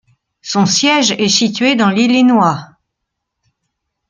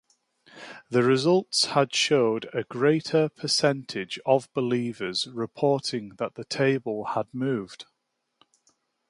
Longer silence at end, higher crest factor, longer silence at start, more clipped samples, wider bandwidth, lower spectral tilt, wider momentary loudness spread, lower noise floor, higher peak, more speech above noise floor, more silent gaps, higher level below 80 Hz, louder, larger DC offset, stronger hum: first, 1.45 s vs 1.25 s; second, 14 dB vs 20 dB; about the same, 0.45 s vs 0.55 s; neither; second, 9.4 kHz vs 11.5 kHz; about the same, -3.5 dB/octave vs -4.5 dB/octave; second, 8 LU vs 11 LU; about the same, -75 dBFS vs -78 dBFS; first, 0 dBFS vs -6 dBFS; first, 64 dB vs 53 dB; neither; first, -58 dBFS vs -70 dBFS; first, -12 LUFS vs -25 LUFS; neither; neither